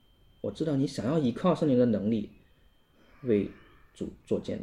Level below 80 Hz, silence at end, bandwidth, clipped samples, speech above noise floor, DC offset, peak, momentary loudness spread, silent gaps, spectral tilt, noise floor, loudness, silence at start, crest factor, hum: -60 dBFS; 0 s; 11 kHz; under 0.1%; 35 dB; under 0.1%; -12 dBFS; 16 LU; none; -8 dB/octave; -63 dBFS; -29 LUFS; 0.45 s; 18 dB; none